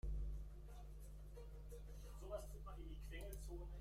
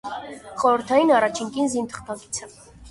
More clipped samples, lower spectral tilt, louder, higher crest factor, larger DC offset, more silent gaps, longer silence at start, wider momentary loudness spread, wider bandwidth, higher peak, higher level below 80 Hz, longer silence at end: neither; first, -6 dB/octave vs -3.5 dB/octave; second, -55 LUFS vs -22 LUFS; about the same, 14 dB vs 18 dB; neither; neither; about the same, 0.05 s vs 0.05 s; second, 7 LU vs 16 LU; first, 16 kHz vs 11.5 kHz; second, -36 dBFS vs -6 dBFS; about the same, -52 dBFS vs -56 dBFS; about the same, 0 s vs 0 s